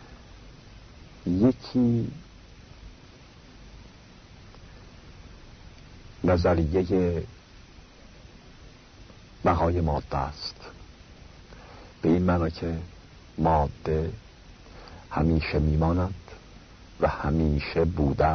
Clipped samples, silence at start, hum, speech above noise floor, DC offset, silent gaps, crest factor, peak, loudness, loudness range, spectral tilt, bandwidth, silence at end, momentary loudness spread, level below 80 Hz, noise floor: under 0.1%; 0 s; none; 25 dB; under 0.1%; none; 18 dB; -10 dBFS; -26 LUFS; 7 LU; -8.5 dB/octave; 6.6 kHz; 0 s; 25 LU; -38 dBFS; -50 dBFS